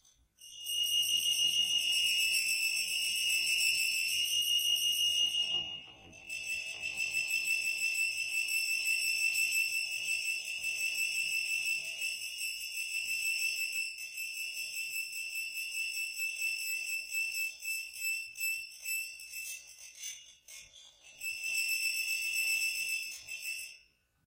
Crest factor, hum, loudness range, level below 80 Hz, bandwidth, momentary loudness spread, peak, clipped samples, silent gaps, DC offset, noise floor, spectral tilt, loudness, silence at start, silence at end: 16 dB; none; 8 LU; -76 dBFS; 16 kHz; 13 LU; -18 dBFS; under 0.1%; none; under 0.1%; -67 dBFS; 3.5 dB/octave; -31 LUFS; 0.4 s; 0.5 s